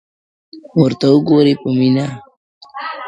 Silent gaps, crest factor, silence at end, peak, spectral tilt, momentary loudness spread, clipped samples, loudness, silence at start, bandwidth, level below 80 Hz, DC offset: 2.37-2.61 s; 16 dB; 0 s; 0 dBFS; -8 dB/octave; 17 LU; under 0.1%; -14 LUFS; 0.55 s; 8.2 kHz; -56 dBFS; under 0.1%